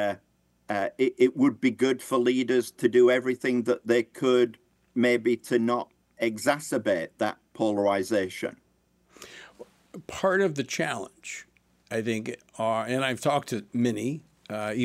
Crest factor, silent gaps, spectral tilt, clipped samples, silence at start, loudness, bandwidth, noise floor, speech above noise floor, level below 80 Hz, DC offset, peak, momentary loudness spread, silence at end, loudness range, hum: 18 dB; none; -5 dB/octave; under 0.1%; 0 s; -26 LUFS; 15 kHz; -67 dBFS; 41 dB; -70 dBFS; under 0.1%; -8 dBFS; 15 LU; 0 s; 7 LU; none